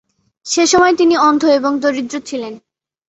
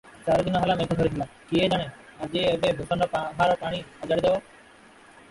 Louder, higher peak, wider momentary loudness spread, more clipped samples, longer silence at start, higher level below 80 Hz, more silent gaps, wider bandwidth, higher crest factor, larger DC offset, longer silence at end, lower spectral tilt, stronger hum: first, -13 LUFS vs -25 LUFS; first, -2 dBFS vs -10 dBFS; first, 14 LU vs 8 LU; neither; first, 0.45 s vs 0.05 s; second, -56 dBFS vs -50 dBFS; neither; second, 8.2 kHz vs 11.5 kHz; about the same, 14 dB vs 16 dB; neither; second, 0.5 s vs 0.9 s; second, -2.5 dB/octave vs -6 dB/octave; neither